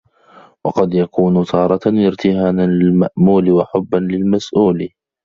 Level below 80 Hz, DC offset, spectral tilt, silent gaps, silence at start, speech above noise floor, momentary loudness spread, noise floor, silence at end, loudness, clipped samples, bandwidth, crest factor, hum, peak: -48 dBFS; under 0.1%; -8.5 dB/octave; none; 0.65 s; 32 dB; 5 LU; -45 dBFS; 0.4 s; -15 LUFS; under 0.1%; 7.2 kHz; 12 dB; none; -2 dBFS